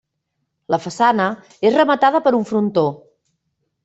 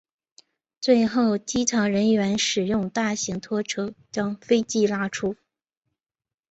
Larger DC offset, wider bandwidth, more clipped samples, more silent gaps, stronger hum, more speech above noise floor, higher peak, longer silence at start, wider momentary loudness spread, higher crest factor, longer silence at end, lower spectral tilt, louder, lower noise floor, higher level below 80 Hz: neither; about the same, 8.2 kHz vs 8.2 kHz; neither; neither; neither; second, 58 dB vs over 67 dB; first, -2 dBFS vs -6 dBFS; about the same, 0.7 s vs 0.8 s; about the same, 8 LU vs 9 LU; about the same, 16 dB vs 18 dB; second, 0.9 s vs 1.15 s; first, -6 dB/octave vs -4 dB/octave; first, -17 LUFS vs -24 LUFS; second, -74 dBFS vs under -90 dBFS; about the same, -64 dBFS vs -60 dBFS